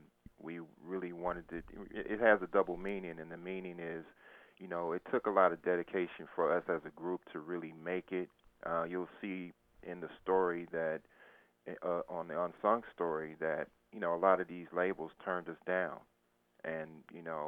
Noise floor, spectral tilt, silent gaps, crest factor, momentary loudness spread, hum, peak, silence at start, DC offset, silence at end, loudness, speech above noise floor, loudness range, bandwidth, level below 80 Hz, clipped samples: -73 dBFS; -8 dB/octave; none; 24 dB; 16 LU; none; -14 dBFS; 0.4 s; under 0.1%; 0 s; -37 LUFS; 36 dB; 4 LU; 4.3 kHz; -68 dBFS; under 0.1%